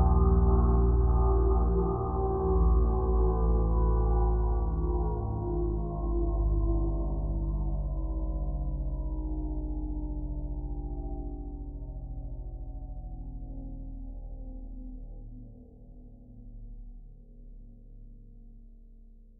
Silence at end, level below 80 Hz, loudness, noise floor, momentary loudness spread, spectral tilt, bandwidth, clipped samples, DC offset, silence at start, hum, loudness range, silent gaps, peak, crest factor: 0.25 s; -30 dBFS; -30 LUFS; -52 dBFS; 19 LU; -15 dB/octave; 1.6 kHz; under 0.1%; under 0.1%; 0 s; none; 21 LU; none; -14 dBFS; 16 dB